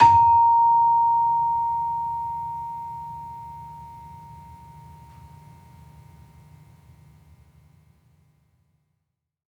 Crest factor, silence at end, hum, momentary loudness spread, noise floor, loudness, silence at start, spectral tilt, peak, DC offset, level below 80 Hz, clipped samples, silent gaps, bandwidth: 20 dB; 5.1 s; none; 26 LU; -80 dBFS; -20 LUFS; 0 s; -5.5 dB/octave; -4 dBFS; under 0.1%; -56 dBFS; under 0.1%; none; 7.6 kHz